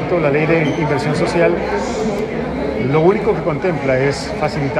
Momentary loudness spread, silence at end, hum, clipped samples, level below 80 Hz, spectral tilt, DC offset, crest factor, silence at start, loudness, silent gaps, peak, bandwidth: 6 LU; 0 s; none; under 0.1%; -38 dBFS; -6.5 dB/octave; under 0.1%; 16 dB; 0 s; -17 LUFS; none; -2 dBFS; 12 kHz